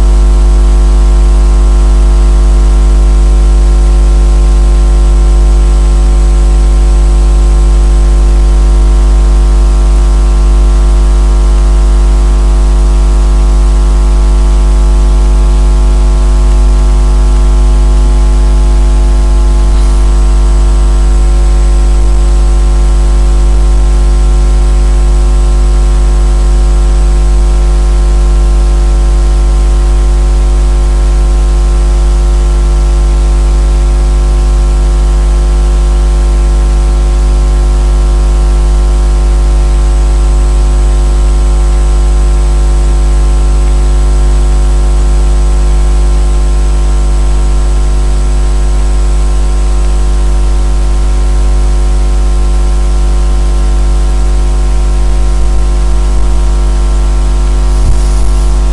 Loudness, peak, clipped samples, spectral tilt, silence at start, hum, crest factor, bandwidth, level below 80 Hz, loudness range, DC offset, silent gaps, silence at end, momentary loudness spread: -10 LUFS; 0 dBFS; under 0.1%; -6 dB/octave; 0 s; 50 Hz at -5 dBFS; 6 dB; 11 kHz; -6 dBFS; 3 LU; under 0.1%; none; 0 s; 3 LU